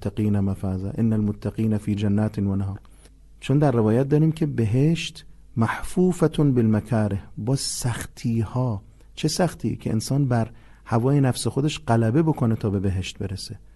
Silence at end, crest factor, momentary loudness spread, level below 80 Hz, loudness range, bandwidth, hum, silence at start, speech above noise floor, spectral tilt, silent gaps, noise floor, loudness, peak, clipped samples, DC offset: 0.2 s; 16 dB; 9 LU; -44 dBFS; 3 LU; 12.5 kHz; none; 0 s; 26 dB; -6.5 dB/octave; none; -48 dBFS; -23 LUFS; -6 dBFS; under 0.1%; under 0.1%